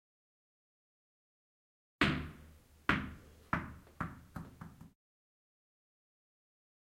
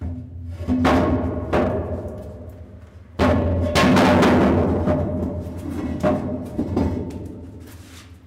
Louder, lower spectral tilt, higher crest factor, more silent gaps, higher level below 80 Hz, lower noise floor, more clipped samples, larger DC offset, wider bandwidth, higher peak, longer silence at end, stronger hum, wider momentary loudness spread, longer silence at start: second, -37 LUFS vs -20 LUFS; about the same, -5.5 dB/octave vs -6.5 dB/octave; first, 30 dB vs 16 dB; neither; second, -58 dBFS vs -38 dBFS; first, -60 dBFS vs -42 dBFS; neither; neither; about the same, 16 kHz vs 16 kHz; second, -14 dBFS vs -4 dBFS; first, 2.1 s vs 0.1 s; neither; about the same, 21 LU vs 22 LU; first, 2 s vs 0 s